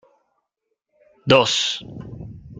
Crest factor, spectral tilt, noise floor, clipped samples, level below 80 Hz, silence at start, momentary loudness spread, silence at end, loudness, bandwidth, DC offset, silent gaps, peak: 22 dB; -3.5 dB/octave; -77 dBFS; under 0.1%; -52 dBFS; 1.25 s; 22 LU; 0 s; -18 LUFS; 9.4 kHz; under 0.1%; none; -2 dBFS